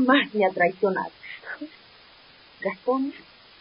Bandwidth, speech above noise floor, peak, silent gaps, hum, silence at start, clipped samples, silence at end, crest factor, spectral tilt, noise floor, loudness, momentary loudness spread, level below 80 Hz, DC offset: 5.4 kHz; 29 dB; -6 dBFS; none; none; 0 s; under 0.1%; 0.4 s; 20 dB; -9.5 dB/octave; -52 dBFS; -25 LUFS; 18 LU; -72 dBFS; under 0.1%